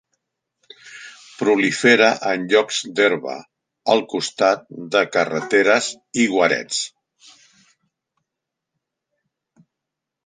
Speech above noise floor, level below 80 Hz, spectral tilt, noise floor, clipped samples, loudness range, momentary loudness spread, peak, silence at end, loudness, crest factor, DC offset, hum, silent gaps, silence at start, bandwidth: 65 dB; -70 dBFS; -3 dB/octave; -83 dBFS; under 0.1%; 6 LU; 17 LU; -2 dBFS; 3.35 s; -18 LUFS; 20 dB; under 0.1%; none; none; 0.85 s; 10 kHz